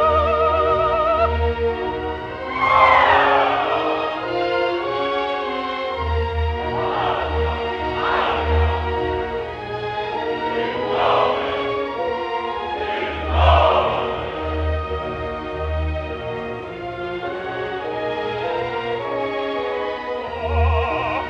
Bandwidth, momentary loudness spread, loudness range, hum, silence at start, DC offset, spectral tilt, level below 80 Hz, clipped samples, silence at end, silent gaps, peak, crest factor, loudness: 6.8 kHz; 11 LU; 8 LU; none; 0 s; under 0.1%; -7 dB/octave; -30 dBFS; under 0.1%; 0 s; none; 0 dBFS; 20 dB; -21 LUFS